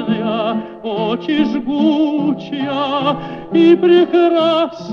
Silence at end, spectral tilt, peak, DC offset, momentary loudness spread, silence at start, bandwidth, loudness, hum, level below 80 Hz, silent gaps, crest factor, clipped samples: 0 s; -7.5 dB/octave; -2 dBFS; under 0.1%; 10 LU; 0 s; 6.2 kHz; -15 LUFS; none; -54 dBFS; none; 14 dB; under 0.1%